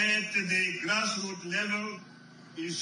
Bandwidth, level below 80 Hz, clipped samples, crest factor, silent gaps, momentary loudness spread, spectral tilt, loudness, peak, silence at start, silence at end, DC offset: 11 kHz; -84 dBFS; under 0.1%; 18 dB; none; 13 LU; -2.5 dB/octave; -29 LUFS; -14 dBFS; 0 s; 0 s; under 0.1%